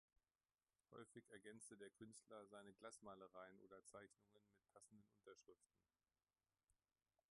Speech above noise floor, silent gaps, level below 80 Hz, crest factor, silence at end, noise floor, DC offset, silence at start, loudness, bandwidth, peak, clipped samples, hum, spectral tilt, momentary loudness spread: over 25 dB; none; under -90 dBFS; 22 dB; 0.6 s; under -90 dBFS; under 0.1%; 0.9 s; -64 LUFS; 11 kHz; -46 dBFS; under 0.1%; none; -3.5 dB/octave; 5 LU